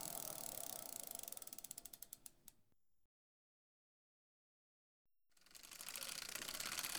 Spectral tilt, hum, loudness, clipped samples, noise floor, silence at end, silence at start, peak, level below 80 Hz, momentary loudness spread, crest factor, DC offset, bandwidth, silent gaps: 0 dB/octave; none; -48 LUFS; under 0.1%; -82 dBFS; 0 s; 0 s; -24 dBFS; -76 dBFS; 15 LU; 28 dB; under 0.1%; over 20 kHz; 3.05-5.05 s